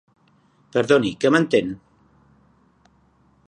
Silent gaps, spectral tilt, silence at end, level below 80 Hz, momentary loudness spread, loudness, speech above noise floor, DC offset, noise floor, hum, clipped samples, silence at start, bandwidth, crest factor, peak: none; -5.5 dB/octave; 1.7 s; -60 dBFS; 13 LU; -20 LUFS; 41 dB; under 0.1%; -59 dBFS; none; under 0.1%; 0.75 s; 10 kHz; 20 dB; -4 dBFS